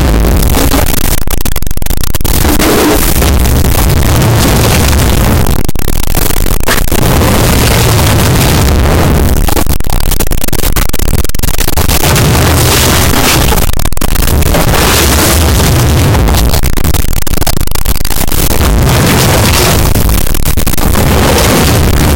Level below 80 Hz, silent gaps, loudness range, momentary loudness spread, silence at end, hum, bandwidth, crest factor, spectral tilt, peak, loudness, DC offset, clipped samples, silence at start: -12 dBFS; none; 2 LU; 6 LU; 0 s; none; 17.5 kHz; 6 dB; -4.5 dB/octave; 0 dBFS; -9 LUFS; 4%; under 0.1%; 0 s